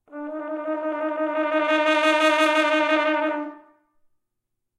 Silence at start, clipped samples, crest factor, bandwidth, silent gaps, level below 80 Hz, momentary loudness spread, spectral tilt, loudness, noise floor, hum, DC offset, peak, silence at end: 0.1 s; under 0.1%; 16 dB; 13 kHz; none; -82 dBFS; 13 LU; -1 dB/octave; -21 LUFS; -79 dBFS; none; under 0.1%; -6 dBFS; 1.2 s